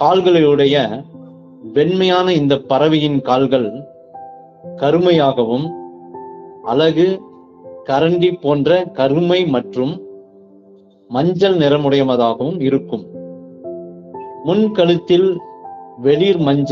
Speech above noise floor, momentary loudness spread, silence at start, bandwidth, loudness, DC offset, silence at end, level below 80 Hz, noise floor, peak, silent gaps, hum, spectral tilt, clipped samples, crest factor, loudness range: 32 dB; 20 LU; 0 s; 7 kHz; -15 LUFS; under 0.1%; 0 s; -56 dBFS; -46 dBFS; 0 dBFS; none; none; -5 dB/octave; under 0.1%; 14 dB; 3 LU